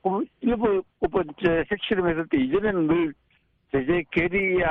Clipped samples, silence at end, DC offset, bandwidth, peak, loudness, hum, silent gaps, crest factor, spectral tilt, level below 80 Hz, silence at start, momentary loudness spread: under 0.1%; 0 s; under 0.1%; 4.1 kHz; -10 dBFS; -24 LUFS; none; none; 14 dB; -9 dB/octave; -46 dBFS; 0.05 s; 4 LU